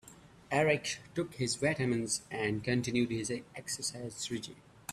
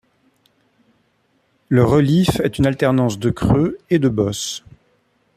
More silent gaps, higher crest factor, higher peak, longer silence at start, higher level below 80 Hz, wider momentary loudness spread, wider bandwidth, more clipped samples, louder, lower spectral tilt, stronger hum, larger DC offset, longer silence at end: neither; about the same, 20 dB vs 16 dB; second, -14 dBFS vs -2 dBFS; second, 0.05 s vs 1.7 s; second, -64 dBFS vs -40 dBFS; first, 10 LU vs 7 LU; about the same, 14.5 kHz vs 14.5 kHz; neither; second, -34 LUFS vs -17 LUFS; second, -4 dB/octave vs -6.5 dB/octave; neither; neither; second, 0 s vs 0.8 s